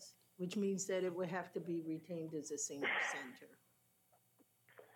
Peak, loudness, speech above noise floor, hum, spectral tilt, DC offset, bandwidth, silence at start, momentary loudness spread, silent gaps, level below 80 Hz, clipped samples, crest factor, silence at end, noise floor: -26 dBFS; -41 LUFS; 33 dB; none; -4 dB/octave; under 0.1%; 18.5 kHz; 0 s; 10 LU; none; under -90 dBFS; under 0.1%; 18 dB; 0.1 s; -75 dBFS